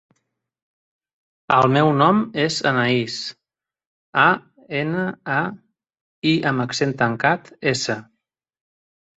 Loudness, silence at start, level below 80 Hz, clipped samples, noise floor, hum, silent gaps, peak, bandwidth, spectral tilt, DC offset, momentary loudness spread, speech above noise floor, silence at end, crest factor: -20 LUFS; 1.5 s; -60 dBFS; under 0.1%; -77 dBFS; none; 3.87-4.13 s, 6.01-6.22 s; -2 dBFS; 8.2 kHz; -5 dB/octave; under 0.1%; 10 LU; 57 dB; 1.15 s; 20 dB